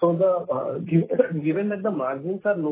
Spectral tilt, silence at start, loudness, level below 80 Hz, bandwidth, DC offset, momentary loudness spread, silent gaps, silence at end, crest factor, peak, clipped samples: -12.5 dB/octave; 0 s; -24 LUFS; -68 dBFS; 4 kHz; under 0.1%; 6 LU; none; 0 s; 18 dB; -6 dBFS; under 0.1%